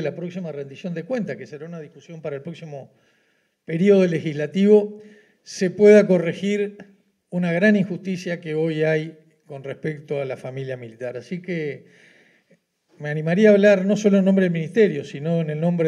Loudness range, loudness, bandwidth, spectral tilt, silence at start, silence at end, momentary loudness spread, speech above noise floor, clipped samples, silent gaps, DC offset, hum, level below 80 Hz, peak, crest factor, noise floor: 13 LU; -20 LUFS; 10 kHz; -7 dB/octave; 0 s; 0 s; 20 LU; 46 dB; under 0.1%; none; under 0.1%; none; -82 dBFS; -2 dBFS; 20 dB; -66 dBFS